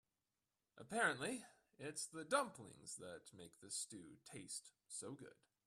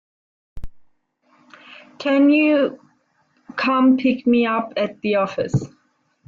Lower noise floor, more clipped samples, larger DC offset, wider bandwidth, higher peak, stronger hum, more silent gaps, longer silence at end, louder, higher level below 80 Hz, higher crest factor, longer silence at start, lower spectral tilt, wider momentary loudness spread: first, under -90 dBFS vs -63 dBFS; neither; neither; first, 14.5 kHz vs 7.4 kHz; second, -22 dBFS vs -6 dBFS; neither; neither; second, 0.35 s vs 0.6 s; second, -46 LUFS vs -19 LUFS; second, -86 dBFS vs -48 dBFS; first, 26 dB vs 14 dB; first, 0.75 s vs 0.55 s; second, -2.5 dB/octave vs -7 dB/octave; first, 19 LU vs 10 LU